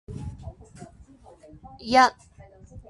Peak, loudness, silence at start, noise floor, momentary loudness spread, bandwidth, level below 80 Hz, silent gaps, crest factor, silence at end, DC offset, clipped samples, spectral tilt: -4 dBFS; -20 LUFS; 0.1 s; -51 dBFS; 27 LU; 11.5 kHz; -48 dBFS; none; 24 dB; 0.1 s; under 0.1%; under 0.1%; -4 dB/octave